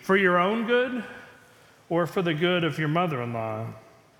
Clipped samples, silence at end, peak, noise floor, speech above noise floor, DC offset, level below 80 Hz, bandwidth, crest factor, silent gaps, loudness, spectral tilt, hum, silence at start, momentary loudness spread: under 0.1%; 0.4 s; -8 dBFS; -55 dBFS; 30 dB; under 0.1%; -68 dBFS; 17 kHz; 18 dB; none; -25 LUFS; -6.5 dB/octave; none; 0 s; 14 LU